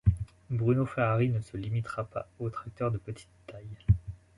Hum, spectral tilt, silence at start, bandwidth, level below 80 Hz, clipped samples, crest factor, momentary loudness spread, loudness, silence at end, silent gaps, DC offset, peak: none; -9 dB/octave; 0.05 s; 11 kHz; -42 dBFS; under 0.1%; 20 dB; 17 LU; -31 LUFS; 0.2 s; none; under 0.1%; -10 dBFS